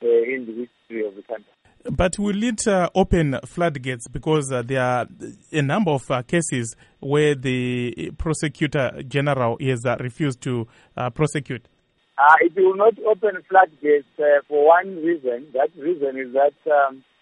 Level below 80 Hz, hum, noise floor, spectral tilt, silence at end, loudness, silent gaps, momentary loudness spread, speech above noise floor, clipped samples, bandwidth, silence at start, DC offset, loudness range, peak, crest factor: -42 dBFS; none; -48 dBFS; -5.5 dB/octave; 0.2 s; -21 LUFS; none; 13 LU; 28 dB; under 0.1%; 11.5 kHz; 0 s; under 0.1%; 6 LU; 0 dBFS; 20 dB